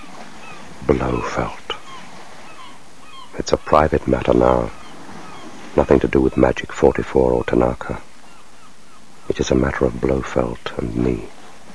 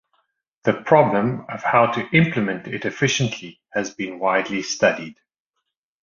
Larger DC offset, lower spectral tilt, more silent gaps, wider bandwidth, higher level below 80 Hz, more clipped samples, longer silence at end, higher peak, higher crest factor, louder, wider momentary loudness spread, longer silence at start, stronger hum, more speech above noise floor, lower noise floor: first, 2% vs under 0.1%; first, -6.5 dB/octave vs -5 dB/octave; neither; first, 11 kHz vs 7.4 kHz; first, -34 dBFS vs -60 dBFS; neither; second, 0 s vs 0.9 s; about the same, 0 dBFS vs -2 dBFS; about the same, 20 dB vs 20 dB; about the same, -19 LUFS vs -20 LUFS; first, 22 LU vs 11 LU; second, 0 s vs 0.65 s; neither; second, 29 dB vs 58 dB; second, -47 dBFS vs -79 dBFS